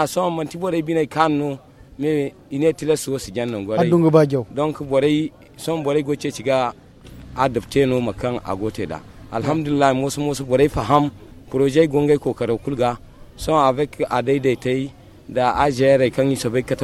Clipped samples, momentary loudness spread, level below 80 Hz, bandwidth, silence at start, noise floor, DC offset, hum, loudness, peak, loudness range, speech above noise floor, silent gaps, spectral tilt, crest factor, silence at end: under 0.1%; 10 LU; -46 dBFS; 14.5 kHz; 0 s; -40 dBFS; under 0.1%; none; -20 LUFS; 0 dBFS; 3 LU; 21 dB; none; -6 dB/octave; 20 dB; 0 s